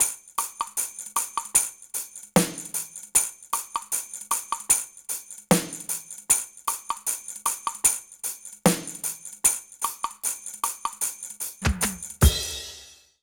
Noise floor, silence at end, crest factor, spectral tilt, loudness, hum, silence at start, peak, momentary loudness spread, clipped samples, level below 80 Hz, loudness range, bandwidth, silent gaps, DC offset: -48 dBFS; 0.3 s; 24 dB; -3 dB/octave; -26 LUFS; none; 0 s; -2 dBFS; 10 LU; under 0.1%; -38 dBFS; 1 LU; over 20 kHz; none; under 0.1%